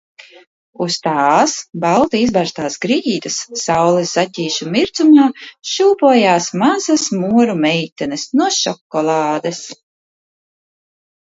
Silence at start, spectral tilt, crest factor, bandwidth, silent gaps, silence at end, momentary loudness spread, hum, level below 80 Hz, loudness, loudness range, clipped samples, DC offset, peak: 0.8 s; -4 dB/octave; 16 dB; 8 kHz; 7.92-7.96 s, 8.81-8.90 s; 1.5 s; 10 LU; none; -56 dBFS; -15 LUFS; 5 LU; under 0.1%; under 0.1%; 0 dBFS